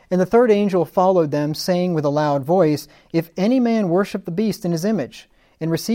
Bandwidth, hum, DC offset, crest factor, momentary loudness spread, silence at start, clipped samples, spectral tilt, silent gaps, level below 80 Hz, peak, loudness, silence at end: 17 kHz; none; under 0.1%; 14 dB; 9 LU; 0.1 s; under 0.1%; -6.5 dB/octave; none; -56 dBFS; -4 dBFS; -19 LUFS; 0 s